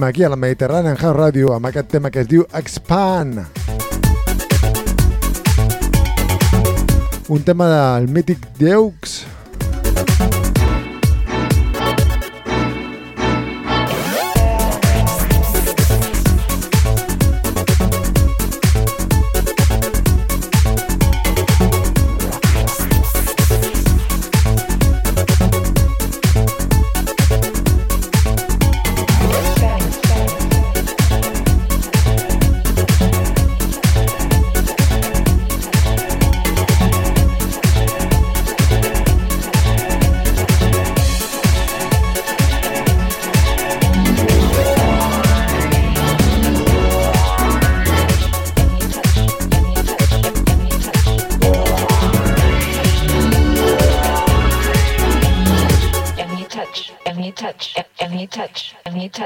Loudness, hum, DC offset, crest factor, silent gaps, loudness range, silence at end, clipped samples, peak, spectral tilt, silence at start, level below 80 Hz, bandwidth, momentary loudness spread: -16 LUFS; none; under 0.1%; 14 dB; none; 3 LU; 0 s; under 0.1%; 0 dBFS; -5.5 dB/octave; 0 s; -18 dBFS; 17.5 kHz; 5 LU